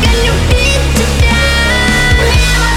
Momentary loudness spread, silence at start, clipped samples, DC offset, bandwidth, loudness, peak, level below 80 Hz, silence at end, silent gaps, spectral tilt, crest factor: 2 LU; 0 s; under 0.1%; under 0.1%; 16.5 kHz; -10 LUFS; 0 dBFS; -14 dBFS; 0 s; none; -4 dB/octave; 10 dB